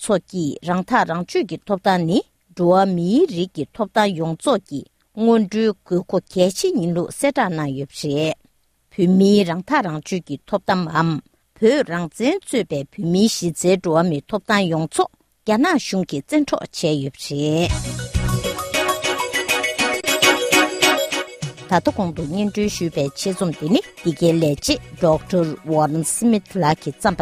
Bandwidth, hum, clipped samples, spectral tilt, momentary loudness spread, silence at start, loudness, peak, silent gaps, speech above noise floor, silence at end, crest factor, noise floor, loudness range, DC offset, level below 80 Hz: 15.5 kHz; none; under 0.1%; -4.5 dB/octave; 9 LU; 0 s; -19 LUFS; 0 dBFS; none; 41 dB; 0 s; 20 dB; -60 dBFS; 3 LU; under 0.1%; -42 dBFS